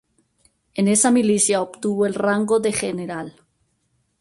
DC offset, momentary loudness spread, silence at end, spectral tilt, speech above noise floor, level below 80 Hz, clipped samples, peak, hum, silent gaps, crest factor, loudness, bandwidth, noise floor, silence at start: under 0.1%; 15 LU; 0.9 s; -4 dB/octave; 49 dB; -60 dBFS; under 0.1%; -6 dBFS; none; none; 16 dB; -19 LUFS; 11.5 kHz; -68 dBFS; 0.75 s